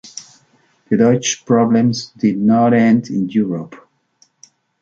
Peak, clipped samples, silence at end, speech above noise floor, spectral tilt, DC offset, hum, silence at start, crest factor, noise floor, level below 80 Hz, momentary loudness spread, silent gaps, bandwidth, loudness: -2 dBFS; under 0.1%; 1.05 s; 43 dB; -5.5 dB/octave; under 0.1%; none; 0.05 s; 14 dB; -57 dBFS; -58 dBFS; 13 LU; none; 7.6 kHz; -15 LUFS